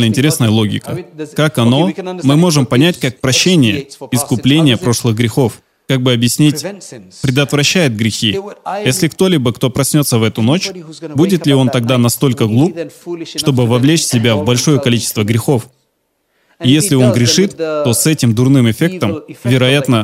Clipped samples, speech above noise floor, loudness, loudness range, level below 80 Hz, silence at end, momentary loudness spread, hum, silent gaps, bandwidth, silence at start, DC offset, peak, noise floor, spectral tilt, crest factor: under 0.1%; 52 dB; -12 LUFS; 2 LU; -48 dBFS; 0 s; 10 LU; none; none; 16.5 kHz; 0 s; under 0.1%; 0 dBFS; -64 dBFS; -5 dB/octave; 12 dB